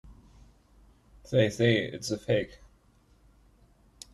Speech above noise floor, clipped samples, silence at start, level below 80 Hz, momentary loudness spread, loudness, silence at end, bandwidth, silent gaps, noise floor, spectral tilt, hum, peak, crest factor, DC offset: 36 dB; under 0.1%; 0.05 s; -56 dBFS; 14 LU; -28 LUFS; 1.6 s; 12.5 kHz; none; -62 dBFS; -5.5 dB/octave; none; -10 dBFS; 22 dB; under 0.1%